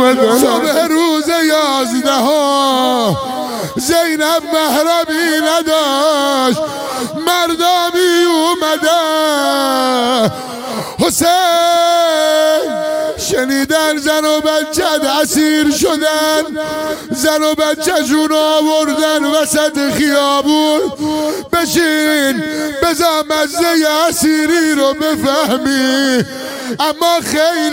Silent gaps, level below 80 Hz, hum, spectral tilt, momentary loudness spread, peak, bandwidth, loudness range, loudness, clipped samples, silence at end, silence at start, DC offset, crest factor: none; -48 dBFS; none; -3 dB/octave; 6 LU; 0 dBFS; 16.5 kHz; 1 LU; -13 LUFS; under 0.1%; 0 s; 0 s; under 0.1%; 12 dB